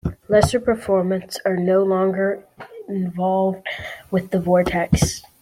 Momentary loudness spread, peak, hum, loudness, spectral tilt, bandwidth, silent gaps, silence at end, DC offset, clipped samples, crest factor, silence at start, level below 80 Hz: 12 LU; -2 dBFS; none; -20 LUFS; -6 dB/octave; 16 kHz; none; 0.2 s; under 0.1%; under 0.1%; 18 dB; 0.05 s; -40 dBFS